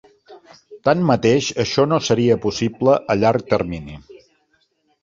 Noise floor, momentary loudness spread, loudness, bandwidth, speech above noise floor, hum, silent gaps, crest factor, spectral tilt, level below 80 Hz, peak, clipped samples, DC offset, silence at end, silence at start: -64 dBFS; 7 LU; -18 LUFS; 7.6 kHz; 47 dB; none; none; 18 dB; -5.5 dB/octave; -48 dBFS; -2 dBFS; under 0.1%; under 0.1%; 0.85 s; 0.3 s